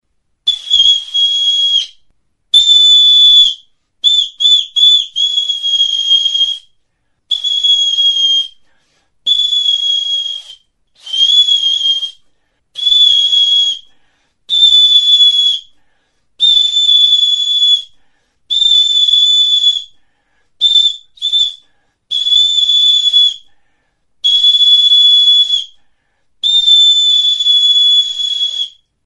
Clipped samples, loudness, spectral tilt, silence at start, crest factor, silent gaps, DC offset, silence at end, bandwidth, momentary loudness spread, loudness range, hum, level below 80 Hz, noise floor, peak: under 0.1%; -8 LUFS; 4 dB/octave; 0.45 s; 12 dB; none; under 0.1%; 0.35 s; 11.5 kHz; 11 LU; 5 LU; none; -54 dBFS; -62 dBFS; 0 dBFS